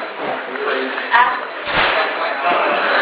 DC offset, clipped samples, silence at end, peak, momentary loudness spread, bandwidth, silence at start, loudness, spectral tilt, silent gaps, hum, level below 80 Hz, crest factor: under 0.1%; under 0.1%; 0 s; 0 dBFS; 9 LU; 4 kHz; 0 s; -17 LUFS; -6.5 dB/octave; none; none; -52 dBFS; 18 dB